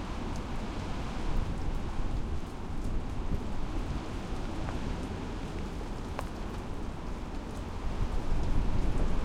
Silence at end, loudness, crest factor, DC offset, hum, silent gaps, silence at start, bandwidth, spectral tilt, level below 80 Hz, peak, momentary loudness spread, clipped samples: 0 s; -37 LUFS; 14 dB; under 0.1%; none; none; 0 s; 10.5 kHz; -6.5 dB/octave; -34 dBFS; -16 dBFS; 6 LU; under 0.1%